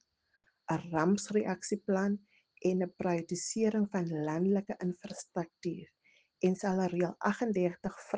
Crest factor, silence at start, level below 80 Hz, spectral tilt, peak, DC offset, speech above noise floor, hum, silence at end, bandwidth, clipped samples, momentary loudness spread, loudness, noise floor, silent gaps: 18 dB; 0.7 s; -72 dBFS; -6 dB/octave; -14 dBFS; under 0.1%; 43 dB; none; 0 s; 9.8 kHz; under 0.1%; 9 LU; -34 LUFS; -76 dBFS; none